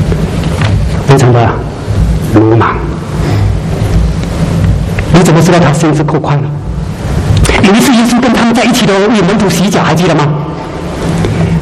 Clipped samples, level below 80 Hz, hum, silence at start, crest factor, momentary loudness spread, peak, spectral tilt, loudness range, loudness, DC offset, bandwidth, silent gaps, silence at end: 0.7%; -18 dBFS; none; 0 s; 8 dB; 10 LU; 0 dBFS; -6 dB/octave; 3 LU; -9 LUFS; under 0.1%; 15 kHz; none; 0 s